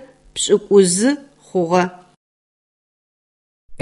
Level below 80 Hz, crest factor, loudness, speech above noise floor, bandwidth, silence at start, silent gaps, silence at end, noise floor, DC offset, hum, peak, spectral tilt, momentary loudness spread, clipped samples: -58 dBFS; 18 dB; -17 LUFS; over 75 dB; 11.5 kHz; 0.35 s; 2.17-3.69 s; 0 s; under -90 dBFS; under 0.1%; none; 0 dBFS; -4 dB/octave; 12 LU; under 0.1%